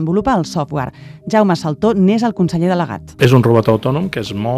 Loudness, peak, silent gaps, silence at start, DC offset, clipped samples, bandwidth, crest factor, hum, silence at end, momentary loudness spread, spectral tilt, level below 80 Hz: -15 LUFS; 0 dBFS; none; 0 s; under 0.1%; under 0.1%; 14.5 kHz; 14 dB; none; 0 s; 10 LU; -7.5 dB/octave; -44 dBFS